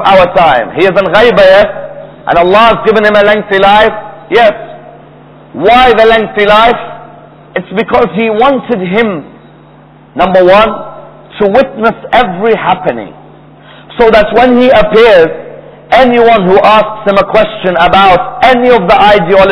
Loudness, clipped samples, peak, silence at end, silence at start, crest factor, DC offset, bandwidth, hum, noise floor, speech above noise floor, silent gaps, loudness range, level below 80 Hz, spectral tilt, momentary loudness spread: -6 LUFS; 6%; 0 dBFS; 0 s; 0 s; 8 dB; 0.6%; 5.4 kHz; none; -36 dBFS; 31 dB; none; 4 LU; -32 dBFS; -7 dB/octave; 13 LU